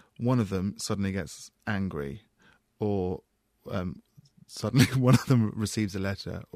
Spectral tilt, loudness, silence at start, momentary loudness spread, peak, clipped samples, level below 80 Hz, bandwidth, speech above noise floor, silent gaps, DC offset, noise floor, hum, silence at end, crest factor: -6 dB/octave; -28 LUFS; 0.2 s; 16 LU; -6 dBFS; under 0.1%; -56 dBFS; 15.5 kHz; 36 dB; none; under 0.1%; -64 dBFS; none; 0.15 s; 22 dB